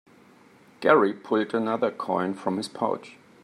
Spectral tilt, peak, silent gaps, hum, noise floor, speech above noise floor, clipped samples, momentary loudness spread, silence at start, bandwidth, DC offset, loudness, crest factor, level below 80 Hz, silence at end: -6 dB/octave; -4 dBFS; none; none; -55 dBFS; 30 dB; under 0.1%; 9 LU; 0.8 s; 12.5 kHz; under 0.1%; -25 LUFS; 22 dB; -74 dBFS; 0.3 s